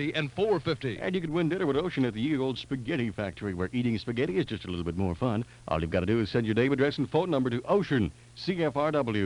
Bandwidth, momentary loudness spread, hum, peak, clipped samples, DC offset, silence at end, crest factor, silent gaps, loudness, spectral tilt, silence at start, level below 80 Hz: 11 kHz; 7 LU; none; -12 dBFS; under 0.1%; under 0.1%; 0 s; 16 dB; none; -29 LUFS; -7.5 dB/octave; 0 s; -52 dBFS